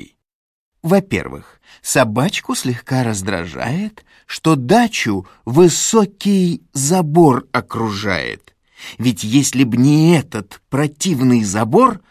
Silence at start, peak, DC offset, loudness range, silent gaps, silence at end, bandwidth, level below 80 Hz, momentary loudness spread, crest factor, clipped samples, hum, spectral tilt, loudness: 0 s; 0 dBFS; under 0.1%; 4 LU; 0.35-0.72 s; 0.1 s; 15.5 kHz; -46 dBFS; 14 LU; 16 dB; under 0.1%; none; -5 dB/octave; -16 LUFS